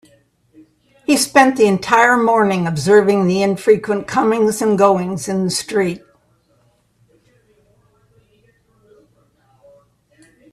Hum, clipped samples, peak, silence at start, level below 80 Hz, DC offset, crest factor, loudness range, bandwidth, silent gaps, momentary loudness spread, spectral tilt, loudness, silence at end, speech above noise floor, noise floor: none; under 0.1%; 0 dBFS; 1.1 s; -58 dBFS; under 0.1%; 18 dB; 11 LU; 14 kHz; none; 8 LU; -5 dB/octave; -15 LUFS; 4.55 s; 44 dB; -58 dBFS